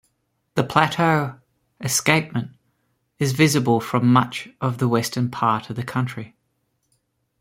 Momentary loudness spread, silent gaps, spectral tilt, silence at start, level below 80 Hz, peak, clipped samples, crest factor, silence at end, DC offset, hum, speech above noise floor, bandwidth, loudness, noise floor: 12 LU; none; -5 dB/octave; 0.55 s; -58 dBFS; -2 dBFS; under 0.1%; 22 dB; 1.15 s; under 0.1%; none; 51 dB; 16.5 kHz; -21 LUFS; -71 dBFS